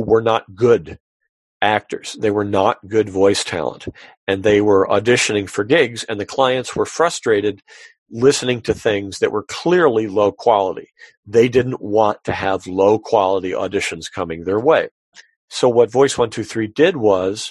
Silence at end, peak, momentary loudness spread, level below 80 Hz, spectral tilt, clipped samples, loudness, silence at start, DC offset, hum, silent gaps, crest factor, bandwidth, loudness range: 0 s; 0 dBFS; 9 LU; -48 dBFS; -4.5 dB/octave; under 0.1%; -17 LUFS; 0 s; under 0.1%; none; 1.00-1.20 s, 1.29-1.60 s, 4.17-4.27 s, 7.98-8.06 s, 11.17-11.23 s, 14.91-15.12 s, 15.36-15.48 s; 16 dB; 12 kHz; 2 LU